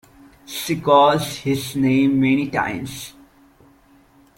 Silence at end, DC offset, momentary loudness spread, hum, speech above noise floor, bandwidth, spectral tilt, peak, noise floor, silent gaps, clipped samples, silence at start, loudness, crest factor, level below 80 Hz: 1.25 s; under 0.1%; 18 LU; none; 34 dB; 17 kHz; -5.5 dB/octave; -2 dBFS; -53 dBFS; none; under 0.1%; 0.5 s; -19 LUFS; 18 dB; -54 dBFS